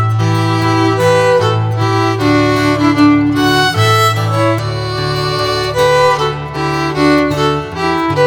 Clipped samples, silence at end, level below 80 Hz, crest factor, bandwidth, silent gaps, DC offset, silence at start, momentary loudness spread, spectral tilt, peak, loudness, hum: under 0.1%; 0 s; -38 dBFS; 12 dB; 18.5 kHz; none; under 0.1%; 0 s; 6 LU; -6 dB/octave; 0 dBFS; -12 LUFS; none